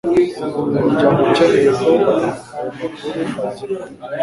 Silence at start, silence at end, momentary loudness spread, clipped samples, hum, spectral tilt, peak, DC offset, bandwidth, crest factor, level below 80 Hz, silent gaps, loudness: 0.05 s; 0 s; 14 LU; under 0.1%; none; -6.5 dB/octave; -2 dBFS; under 0.1%; 11.5 kHz; 14 dB; -50 dBFS; none; -17 LUFS